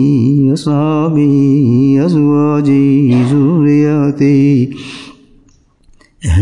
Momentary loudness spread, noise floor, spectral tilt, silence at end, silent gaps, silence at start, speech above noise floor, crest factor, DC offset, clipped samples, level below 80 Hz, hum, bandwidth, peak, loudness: 6 LU; -48 dBFS; -8.5 dB/octave; 0 s; none; 0 s; 39 dB; 8 dB; 0.4%; under 0.1%; -36 dBFS; none; 10.5 kHz; -2 dBFS; -10 LUFS